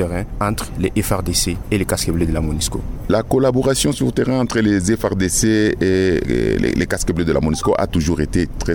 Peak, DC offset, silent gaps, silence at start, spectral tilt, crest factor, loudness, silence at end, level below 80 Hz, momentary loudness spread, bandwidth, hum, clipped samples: -4 dBFS; 0.5%; none; 0 s; -5 dB/octave; 12 dB; -18 LUFS; 0 s; -28 dBFS; 5 LU; 19.5 kHz; none; under 0.1%